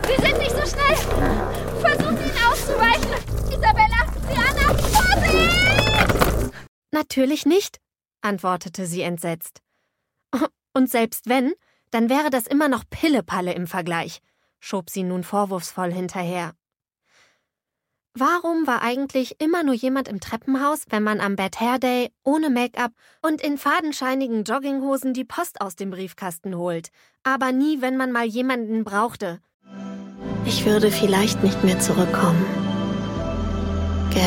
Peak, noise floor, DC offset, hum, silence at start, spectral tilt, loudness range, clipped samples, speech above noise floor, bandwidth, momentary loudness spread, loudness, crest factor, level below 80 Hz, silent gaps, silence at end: 0 dBFS; -82 dBFS; under 0.1%; none; 0 s; -5 dB/octave; 8 LU; under 0.1%; 60 dB; 17 kHz; 12 LU; -22 LUFS; 22 dB; -34 dBFS; 6.68-6.82 s, 29.54-29.60 s; 0 s